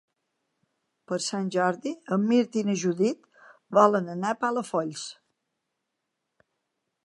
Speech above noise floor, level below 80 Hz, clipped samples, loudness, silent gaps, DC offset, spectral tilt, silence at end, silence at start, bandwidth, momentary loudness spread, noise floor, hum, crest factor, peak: 57 dB; -82 dBFS; under 0.1%; -26 LUFS; none; under 0.1%; -5.5 dB/octave; 1.9 s; 1.1 s; 11.5 kHz; 13 LU; -82 dBFS; none; 22 dB; -6 dBFS